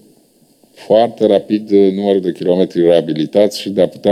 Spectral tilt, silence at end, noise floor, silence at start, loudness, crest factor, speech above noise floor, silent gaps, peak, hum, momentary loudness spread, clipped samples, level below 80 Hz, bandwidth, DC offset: -6.5 dB/octave; 0 s; -52 dBFS; 0.8 s; -14 LUFS; 14 dB; 39 dB; none; 0 dBFS; none; 4 LU; under 0.1%; -60 dBFS; 14.5 kHz; under 0.1%